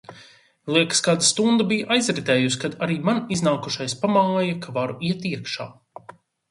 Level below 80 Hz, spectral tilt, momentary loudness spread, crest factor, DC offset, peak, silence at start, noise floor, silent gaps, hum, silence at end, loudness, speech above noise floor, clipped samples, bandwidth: -64 dBFS; -4 dB/octave; 10 LU; 20 dB; under 0.1%; -4 dBFS; 0.1 s; -51 dBFS; none; none; 0.8 s; -22 LUFS; 29 dB; under 0.1%; 11.5 kHz